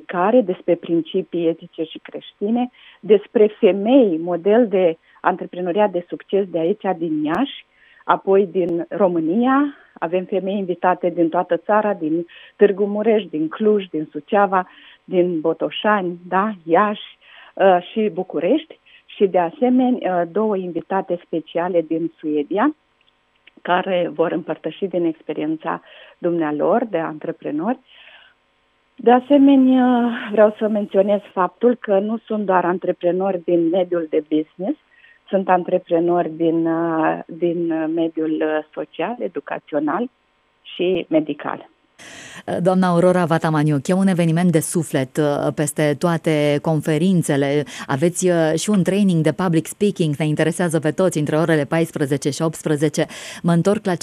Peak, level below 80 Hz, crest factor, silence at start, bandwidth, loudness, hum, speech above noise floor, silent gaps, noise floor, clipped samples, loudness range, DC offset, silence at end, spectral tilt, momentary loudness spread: 0 dBFS; -66 dBFS; 18 dB; 0.1 s; 13.5 kHz; -19 LUFS; none; 44 dB; none; -62 dBFS; under 0.1%; 5 LU; under 0.1%; 0.05 s; -6.5 dB/octave; 10 LU